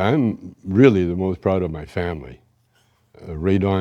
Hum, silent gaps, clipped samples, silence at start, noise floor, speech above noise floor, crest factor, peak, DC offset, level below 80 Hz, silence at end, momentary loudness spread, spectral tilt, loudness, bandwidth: none; none; under 0.1%; 0 s; -61 dBFS; 42 dB; 20 dB; -2 dBFS; under 0.1%; -44 dBFS; 0 s; 15 LU; -8.5 dB/octave; -20 LUFS; 7.8 kHz